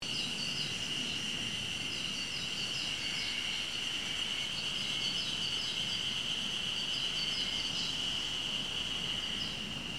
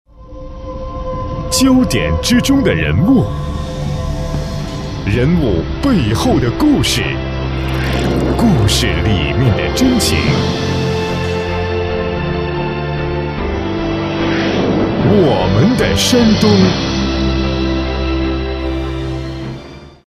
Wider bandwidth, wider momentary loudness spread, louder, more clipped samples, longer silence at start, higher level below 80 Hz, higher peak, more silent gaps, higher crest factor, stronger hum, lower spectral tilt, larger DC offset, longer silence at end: about the same, 16 kHz vs 15.5 kHz; second, 3 LU vs 11 LU; second, -33 LUFS vs -15 LUFS; neither; second, 0 s vs 0.2 s; second, -60 dBFS vs -24 dBFS; second, -22 dBFS vs 0 dBFS; neither; about the same, 14 dB vs 14 dB; neither; second, -1.5 dB/octave vs -5.5 dB/octave; first, 0.2% vs under 0.1%; second, 0 s vs 0.25 s